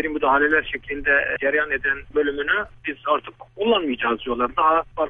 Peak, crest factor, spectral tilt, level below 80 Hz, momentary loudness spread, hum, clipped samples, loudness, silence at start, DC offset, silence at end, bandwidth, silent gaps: -6 dBFS; 16 dB; -7 dB/octave; -46 dBFS; 7 LU; none; under 0.1%; -21 LUFS; 0 s; under 0.1%; 0 s; 3.8 kHz; none